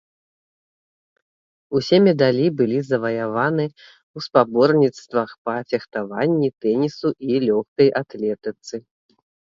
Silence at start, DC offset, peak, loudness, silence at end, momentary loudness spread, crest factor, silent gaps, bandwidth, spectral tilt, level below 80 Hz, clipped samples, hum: 1.7 s; under 0.1%; 0 dBFS; -20 LUFS; 0.75 s; 13 LU; 20 dB; 4.03-4.14 s, 5.38-5.45 s, 7.68-7.76 s; 7.6 kHz; -7 dB/octave; -64 dBFS; under 0.1%; none